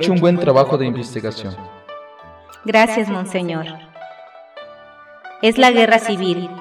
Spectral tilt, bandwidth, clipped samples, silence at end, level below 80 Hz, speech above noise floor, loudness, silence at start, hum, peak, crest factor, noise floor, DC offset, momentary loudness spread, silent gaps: -5.5 dB/octave; 14.5 kHz; under 0.1%; 0 s; -58 dBFS; 26 dB; -16 LUFS; 0 s; none; -2 dBFS; 16 dB; -42 dBFS; under 0.1%; 25 LU; none